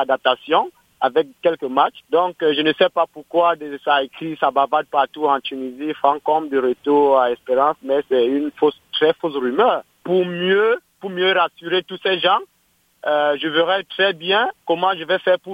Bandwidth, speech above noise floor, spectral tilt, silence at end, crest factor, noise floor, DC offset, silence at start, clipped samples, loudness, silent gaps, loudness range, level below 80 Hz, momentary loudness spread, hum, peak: 15.5 kHz; 43 dB; -6 dB/octave; 0 s; 18 dB; -62 dBFS; under 0.1%; 0 s; under 0.1%; -19 LUFS; none; 1 LU; -66 dBFS; 5 LU; none; 0 dBFS